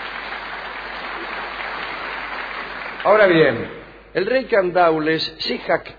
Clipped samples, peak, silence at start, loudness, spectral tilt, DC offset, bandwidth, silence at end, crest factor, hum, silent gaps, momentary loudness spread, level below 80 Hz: under 0.1%; -2 dBFS; 0 s; -20 LUFS; -6.5 dB/octave; under 0.1%; 5 kHz; 0 s; 18 dB; none; none; 14 LU; -50 dBFS